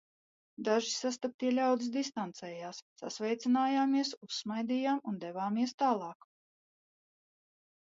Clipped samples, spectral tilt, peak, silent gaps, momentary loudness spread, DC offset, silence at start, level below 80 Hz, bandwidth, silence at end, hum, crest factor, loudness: under 0.1%; -4 dB/octave; -16 dBFS; 1.34-1.39 s, 2.82-2.96 s, 4.17-4.21 s, 5.74-5.78 s; 13 LU; under 0.1%; 0.6 s; -86 dBFS; 7.8 kHz; 1.8 s; none; 18 dB; -33 LUFS